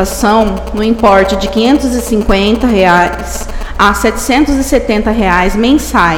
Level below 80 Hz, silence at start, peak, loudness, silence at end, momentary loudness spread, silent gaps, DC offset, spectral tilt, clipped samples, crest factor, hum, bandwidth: -22 dBFS; 0 s; 0 dBFS; -10 LUFS; 0 s; 7 LU; none; under 0.1%; -4.5 dB/octave; 0.5%; 10 dB; none; 18 kHz